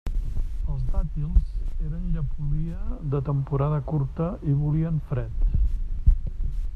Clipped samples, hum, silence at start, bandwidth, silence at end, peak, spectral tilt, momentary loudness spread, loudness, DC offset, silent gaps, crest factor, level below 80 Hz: under 0.1%; none; 0.05 s; 3.5 kHz; 0 s; -4 dBFS; -10.5 dB/octave; 8 LU; -28 LUFS; under 0.1%; none; 18 dB; -26 dBFS